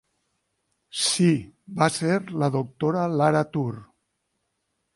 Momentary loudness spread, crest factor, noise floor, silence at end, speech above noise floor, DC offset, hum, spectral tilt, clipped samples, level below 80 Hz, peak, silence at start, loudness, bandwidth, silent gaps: 11 LU; 20 dB; -76 dBFS; 1.1 s; 53 dB; under 0.1%; none; -5 dB/octave; under 0.1%; -64 dBFS; -6 dBFS; 0.95 s; -24 LUFS; 11.5 kHz; none